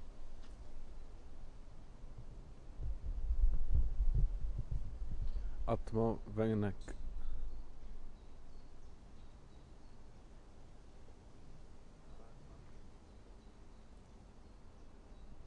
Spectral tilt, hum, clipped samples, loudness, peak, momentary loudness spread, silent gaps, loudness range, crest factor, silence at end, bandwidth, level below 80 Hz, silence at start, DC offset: -8.5 dB/octave; none; under 0.1%; -41 LUFS; -20 dBFS; 23 LU; none; 20 LU; 18 dB; 0 s; 4.7 kHz; -42 dBFS; 0 s; under 0.1%